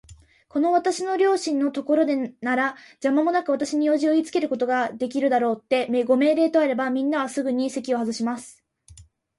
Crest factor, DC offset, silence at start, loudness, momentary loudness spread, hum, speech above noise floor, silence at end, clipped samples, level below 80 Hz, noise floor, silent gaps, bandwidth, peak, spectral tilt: 14 dB; under 0.1%; 0.1 s; -23 LUFS; 6 LU; none; 28 dB; 0.35 s; under 0.1%; -64 dBFS; -50 dBFS; none; 11.5 kHz; -8 dBFS; -4 dB/octave